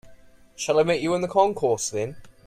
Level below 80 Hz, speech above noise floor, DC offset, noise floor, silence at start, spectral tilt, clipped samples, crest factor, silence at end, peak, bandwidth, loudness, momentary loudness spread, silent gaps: -56 dBFS; 27 dB; under 0.1%; -49 dBFS; 0.05 s; -4 dB/octave; under 0.1%; 18 dB; 0.15 s; -6 dBFS; 15.5 kHz; -23 LUFS; 10 LU; none